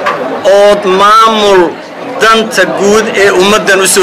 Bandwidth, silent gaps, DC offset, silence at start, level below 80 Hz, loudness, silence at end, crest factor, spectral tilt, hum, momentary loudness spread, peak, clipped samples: 15.5 kHz; none; under 0.1%; 0 s; -40 dBFS; -6 LUFS; 0 s; 6 dB; -3 dB/octave; none; 8 LU; 0 dBFS; 0.2%